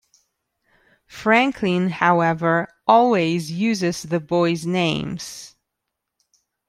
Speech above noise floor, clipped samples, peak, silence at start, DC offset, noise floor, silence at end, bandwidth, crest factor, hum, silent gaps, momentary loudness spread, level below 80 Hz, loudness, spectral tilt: 61 dB; under 0.1%; -2 dBFS; 1.1 s; under 0.1%; -80 dBFS; 1.2 s; 13.5 kHz; 20 dB; none; none; 10 LU; -58 dBFS; -20 LUFS; -5.5 dB/octave